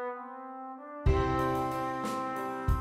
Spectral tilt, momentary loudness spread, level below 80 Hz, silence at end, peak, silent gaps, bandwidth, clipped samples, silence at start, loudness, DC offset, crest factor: -7 dB/octave; 14 LU; -38 dBFS; 0 s; -12 dBFS; none; 16 kHz; under 0.1%; 0 s; -32 LUFS; under 0.1%; 20 dB